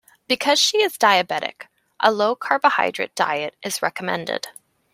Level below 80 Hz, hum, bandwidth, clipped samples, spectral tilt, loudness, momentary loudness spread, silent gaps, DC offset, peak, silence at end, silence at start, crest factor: -72 dBFS; none; 16 kHz; under 0.1%; -2 dB/octave; -20 LUFS; 10 LU; none; under 0.1%; 0 dBFS; 0.45 s; 0.3 s; 20 dB